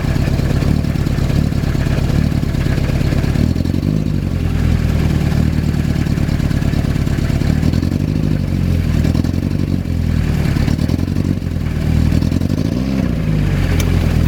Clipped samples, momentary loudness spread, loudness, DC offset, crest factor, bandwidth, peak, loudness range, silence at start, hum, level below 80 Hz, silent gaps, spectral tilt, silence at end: under 0.1%; 2 LU; -17 LUFS; under 0.1%; 14 dB; 18 kHz; 0 dBFS; 1 LU; 0 s; none; -22 dBFS; none; -7.5 dB/octave; 0 s